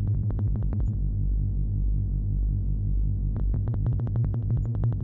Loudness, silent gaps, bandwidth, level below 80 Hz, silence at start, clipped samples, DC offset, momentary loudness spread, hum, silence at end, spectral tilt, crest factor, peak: -28 LUFS; none; 1.8 kHz; -28 dBFS; 0 s; under 0.1%; under 0.1%; 2 LU; 50 Hz at -35 dBFS; 0 s; -13 dB/octave; 8 dB; -16 dBFS